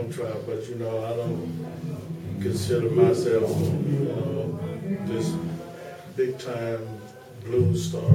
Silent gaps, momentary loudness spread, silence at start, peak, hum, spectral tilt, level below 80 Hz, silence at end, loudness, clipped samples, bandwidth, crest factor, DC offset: none; 13 LU; 0 s; -4 dBFS; none; -7.5 dB/octave; -56 dBFS; 0 s; -27 LUFS; under 0.1%; 16.5 kHz; 22 dB; under 0.1%